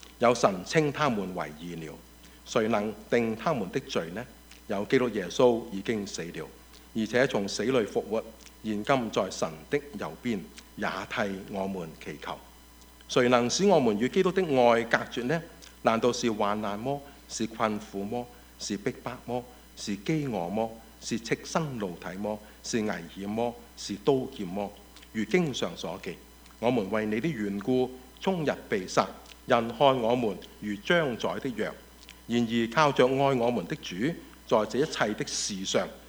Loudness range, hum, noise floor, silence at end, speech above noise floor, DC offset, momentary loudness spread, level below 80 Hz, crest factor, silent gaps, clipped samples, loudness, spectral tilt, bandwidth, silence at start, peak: 7 LU; none; -53 dBFS; 0 s; 24 dB; under 0.1%; 15 LU; -56 dBFS; 22 dB; none; under 0.1%; -29 LUFS; -5 dB/octave; over 20 kHz; 0 s; -6 dBFS